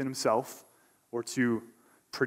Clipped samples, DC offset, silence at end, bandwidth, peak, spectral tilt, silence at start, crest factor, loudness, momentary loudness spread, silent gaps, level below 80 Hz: under 0.1%; under 0.1%; 0 s; 16 kHz; -14 dBFS; -4.5 dB/octave; 0 s; 20 dB; -31 LUFS; 16 LU; none; -74 dBFS